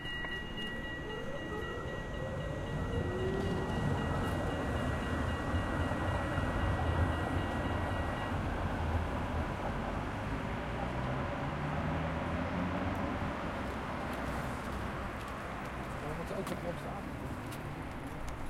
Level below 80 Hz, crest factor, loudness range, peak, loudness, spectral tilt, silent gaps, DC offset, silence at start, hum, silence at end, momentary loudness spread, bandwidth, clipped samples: -44 dBFS; 16 dB; 5 LU; -20 dBFS; -37 LUFS; -6.5 dB/octave; none; under 0.1%; 0 s; none; 0 s; 7 LU; 15.5 kHz; under 0.1%